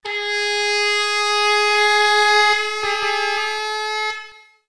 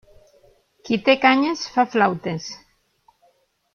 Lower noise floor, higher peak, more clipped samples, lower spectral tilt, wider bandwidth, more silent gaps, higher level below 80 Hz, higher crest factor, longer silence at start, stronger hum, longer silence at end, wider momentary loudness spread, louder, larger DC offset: second, -40 dBFS vs -63 dBFS; about the same, -2 dBFS vs -2 dBFS; neither; second, 1.5 dB/octave vs -4.5 dB/octave; first, 11 kHz vs 7 kHz; neither; about the same, -64 dBFS vs -62 dBFS; about the same, 16 dB vs 20 dB; second, 0.05 s vs 0.85 s; neither; second, 0.15 s vs 1.2 s; second, 9 LU vs 16 LU; first, -17 LUFS vs -20 LUFS; first, 0.7% vs under 0.1%